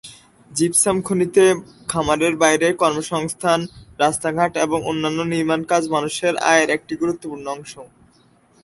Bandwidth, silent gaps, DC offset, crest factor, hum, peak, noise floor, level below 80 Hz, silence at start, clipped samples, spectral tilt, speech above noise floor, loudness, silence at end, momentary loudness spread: 12 kHz; none; under 0.1%; 18 dB; none; -2 dBFS; -55 dBFS; -52 dBFS; 0.05 s; under 0.1%; -3.5 dB/octave; 36 dB; -19 LUFS; 0.75 s; 12 LU